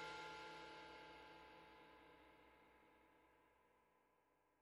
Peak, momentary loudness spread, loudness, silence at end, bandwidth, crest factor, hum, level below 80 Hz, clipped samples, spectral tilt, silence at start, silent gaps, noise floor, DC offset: -42 dBFS; 14 LU; -59 LUFS; 0 s; 14.5 kHz; 18 dB; none; -82 dBFS; under 0.1%; -3 dB/octave; 0 s; none; -81 dBFS; under 0.1%